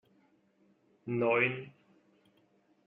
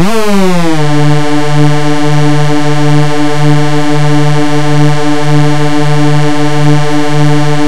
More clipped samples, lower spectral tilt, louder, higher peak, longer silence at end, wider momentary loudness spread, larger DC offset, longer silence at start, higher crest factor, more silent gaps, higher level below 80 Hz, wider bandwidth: neither; second, -4.5 dB/octave vs -6.5 dB/octave; second, -31 LUFS vs -9 LUFS; second, -14 dBFS vs 0 dBFS; first, 1.15 s vs 0 s; first, 22 LU vs 2 LU; second, under 0.1% vs 50%; first, 1.05 s vs 0 s; first, 22 dB vs 12 dB; neither; second, -82 dBFS vs -38 dBFS; second, 4.2 kHz vs 13 kHz